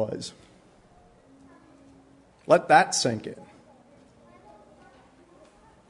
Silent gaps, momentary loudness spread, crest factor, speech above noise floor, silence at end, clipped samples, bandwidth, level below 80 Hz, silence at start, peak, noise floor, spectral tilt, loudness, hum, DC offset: none; 25 LU; 26 dB; 33 dB; 2.45 s; under 0.1%; 11 kHz; -68 dBFS; 0 s; -4 dBFS; -56 dBFS; -3.5 dB/octave; -22 LUFS; none; under 0.1%